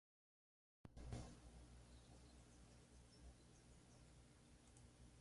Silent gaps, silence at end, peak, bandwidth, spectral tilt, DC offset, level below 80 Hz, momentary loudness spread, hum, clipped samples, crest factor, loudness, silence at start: none; 0 s; -40 dBFS; 11.5 kHz; -5 dB/octave; under 0.1%; -68 dBFS; 12 LU; 60 Hz at -70 dBFS; under 0.1%; 24 dB; -64 LUFS; 0.85 s